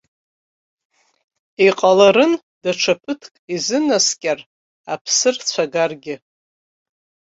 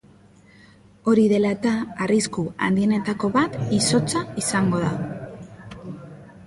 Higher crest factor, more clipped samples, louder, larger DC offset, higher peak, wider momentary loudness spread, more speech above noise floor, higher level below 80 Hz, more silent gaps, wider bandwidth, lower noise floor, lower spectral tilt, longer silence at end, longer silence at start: about the same, 18 dB vs 16 dB; neither; first, -17 LUFS vs -22 LUFS; neither; first, -2 dBFS vs -6 dBFS; about the same, 17 LU vs 19 LU; first, over 73 dB vs 30 dB; second, -64 dBFS vs -54 dBFS; first, 2.43-2.61 s, 3.39-3.48 s, 4.46-4.84 s, 5.01-5.05 s vs none; second, 8 kHz vs 11.5 kHz; first, under -90 dBFS vs -51 dBFS; second, -2.5 dB/octave vs -5 dB/octave; first, 1.25 s vs 0 s; first, 1.6 s vs 1.05 s